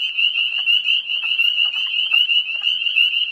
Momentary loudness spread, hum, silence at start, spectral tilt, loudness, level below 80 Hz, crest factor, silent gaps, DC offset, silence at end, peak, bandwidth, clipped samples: 4 LU; none; 0 s; 3.5 dB/octave; -16 LUFS; under -90 dBFS; 14 dB; none; under 0.1%; 0 s; -4 dBFS; 14 kHz; under 0.1%